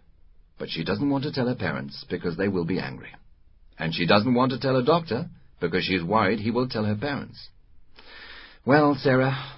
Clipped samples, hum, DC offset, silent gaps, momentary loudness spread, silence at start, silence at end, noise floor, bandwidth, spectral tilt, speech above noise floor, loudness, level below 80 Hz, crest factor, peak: under 0.1%; none; under 0.1%; none; 19 LU; 0.6 s; 0 s; -53 dBFS; 5.8 kHz; -10.5 dB/octave; 29 dB; -25 LUFS; -52 dBFS; 22 dB; -4 dBFS